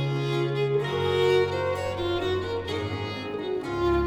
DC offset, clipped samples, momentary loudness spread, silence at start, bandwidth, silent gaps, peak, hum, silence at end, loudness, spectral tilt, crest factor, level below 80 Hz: under 0.1%; under 0.1%; 8 LU; 0 s; 14.5 kHz; none; -10 dBFS; none; 0 s; -27 LUFS; -6.5 dB/octave; 16 dB; -46 dBFS